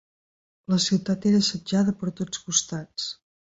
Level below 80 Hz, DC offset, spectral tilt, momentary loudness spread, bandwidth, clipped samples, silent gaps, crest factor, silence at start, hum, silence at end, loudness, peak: -60 dBFS; under 0.1%; -4 dB/octave; 11 LU; 8 kHz; under 0.1%; none; 20 dB; 0.7 s; none; 0.3 s; -25 LUFS; -6 dBFS